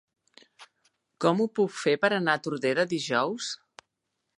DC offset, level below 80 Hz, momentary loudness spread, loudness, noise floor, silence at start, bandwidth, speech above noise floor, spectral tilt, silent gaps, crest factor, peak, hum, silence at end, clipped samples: under 0.1%; -80 dBFS; 8 LU; -27 LUFS; -81 dBFS; 0.6 s; 11.5 kHz; 55 dB; -4.5 dB/octave; none; 20 dB; -8 dBFS; none; 0.85 s; under 0.1%